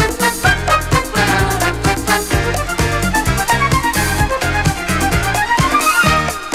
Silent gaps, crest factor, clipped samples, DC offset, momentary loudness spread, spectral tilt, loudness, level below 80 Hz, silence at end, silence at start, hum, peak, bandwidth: none; 14 dB; under 0.1%; under 0.1%; 4 LU; -4 dB/octave; -14 LUFS; -26 dBFS; 0 s; 0 s; none; 0 dBFS; 16.5 kHz